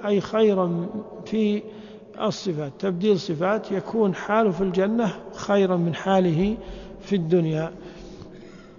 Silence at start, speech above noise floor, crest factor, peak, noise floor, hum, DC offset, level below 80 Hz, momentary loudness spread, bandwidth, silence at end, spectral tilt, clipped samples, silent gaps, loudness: 0 s; 21 dB; 16 dB; -8 dBFS; -43 dBFS; none; under 0.1%; -50 dBFS; 20 LU; 7.2 kHz; 0.05 s; -7 dB/octave; under 0.1%; none; -24 LUFS